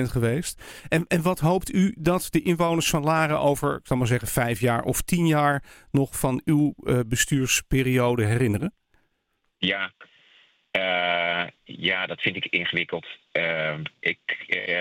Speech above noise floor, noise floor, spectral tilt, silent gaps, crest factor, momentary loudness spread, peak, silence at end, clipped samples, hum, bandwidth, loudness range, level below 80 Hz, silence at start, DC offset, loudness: 50 dB; -74 dBFS; -4.5 dB/octave; none; 18 dB; 7 LU; -6 dBFS; 0 s; under 0.1%; none; 17 kHz; 4 LU; -46 dBFS; 0 s; under 0.1%; -24 LUFS